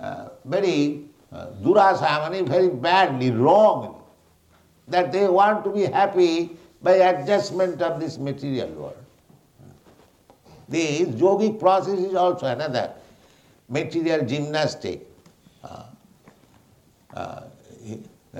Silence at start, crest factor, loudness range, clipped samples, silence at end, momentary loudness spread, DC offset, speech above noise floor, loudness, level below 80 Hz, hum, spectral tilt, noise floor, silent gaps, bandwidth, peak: 0 s; 18 dB; 11 LU; under 0.1%; 0 s; 21 LU; under 0.1%; 37 dB; -21 LUFS; -64 dBFS; none; -6 dB/octave; -58 dBFS; none; 11 kHz; -4 dBFS